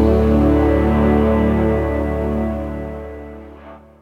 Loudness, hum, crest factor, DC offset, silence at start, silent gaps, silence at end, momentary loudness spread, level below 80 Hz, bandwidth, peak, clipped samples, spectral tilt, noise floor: -17 LUFS; none; 14 dB; under 0.1%; 0 s; none; 0.25 s; 19 LU; -24 dBFS; 5.2 kHz; -2 dBFS; under 0.1%; -9.5 dB/octave; -39 dBFS